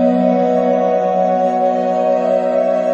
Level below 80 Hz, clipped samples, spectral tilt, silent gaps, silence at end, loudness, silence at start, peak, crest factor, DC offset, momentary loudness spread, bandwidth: -58 dBFS; under 0.1%; -8 dB/octave; none; 0 s; -15 LUFS; 0 s; -2 dBFS; 12 dB; under 0.1%; 2 LU; 7.8 kHz